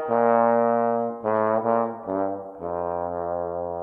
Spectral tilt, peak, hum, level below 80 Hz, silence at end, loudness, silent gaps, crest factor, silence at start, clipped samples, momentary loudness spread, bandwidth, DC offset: -10.5 dB/octave; -8 dBFS; none; -62 dBFS; 0 s; -24 LUFS; none; 16 dB; 0 s; under 0.1%; 10 LU; 3.2 kHz; under 0.1%